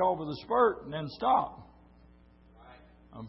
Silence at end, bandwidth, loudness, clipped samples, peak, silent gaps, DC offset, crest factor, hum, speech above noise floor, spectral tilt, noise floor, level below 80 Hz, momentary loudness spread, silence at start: 0 s; 5.8 kHz; -30 LUFS; under 0.1%; -12 dBFS; none; under 0.1%; 20 dB; none; 29 dB; -9.5 dB/octave; -58 dBFS; -60 dBFS; 13 LU; 0 s